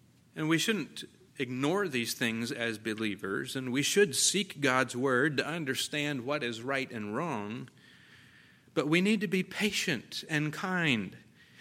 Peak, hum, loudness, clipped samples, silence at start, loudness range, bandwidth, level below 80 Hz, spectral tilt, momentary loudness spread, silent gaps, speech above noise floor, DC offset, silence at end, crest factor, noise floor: -12 dBFS; none; -31 LUFS; under 0.1%; 0.35 s; 5 LU; 16.5 kHz; -74 dBFS; -3.5 dB/octave; 10 LU; none; 28 dB; under 0.1%; 0.4 s; 20 dB; -59 dBFS